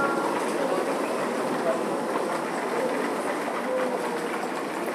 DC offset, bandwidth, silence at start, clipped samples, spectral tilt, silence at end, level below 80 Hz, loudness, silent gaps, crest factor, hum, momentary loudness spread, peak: under 0.1%; 16 kHz; 0 s; under 0.1%; -4 dB/octave; 0 s; -84 dBFS; -27 LUFS; none; 14 dB; none; 3 LU; -12 dBFS